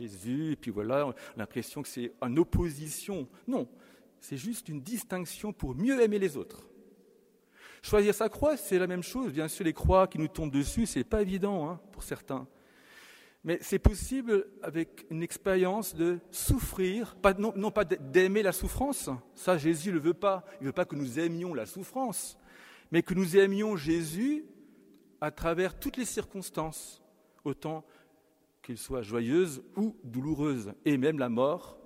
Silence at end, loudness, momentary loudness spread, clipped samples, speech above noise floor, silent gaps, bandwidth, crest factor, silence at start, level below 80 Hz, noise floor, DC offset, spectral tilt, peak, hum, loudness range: 0.1 s; -31 LUFS; 12 LU; under 0.1%; 37 dB; none; 16 kHz; 24 dB; 0 s; -46 dBFS; -68 dBFS; under 0.1%; -5.5 dB/octave; -6 dBFS; none; 6 LU